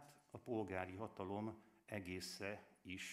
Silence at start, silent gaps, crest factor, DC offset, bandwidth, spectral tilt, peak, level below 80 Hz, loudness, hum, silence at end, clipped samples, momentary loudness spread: 0 s; none; 22 dB; under 0.1%; 15.5 kHz; -5 dB/octave; -28 dBFS; -84 dBFS; -49 LUFS; none; 0 s; under 0.1%; 11 LU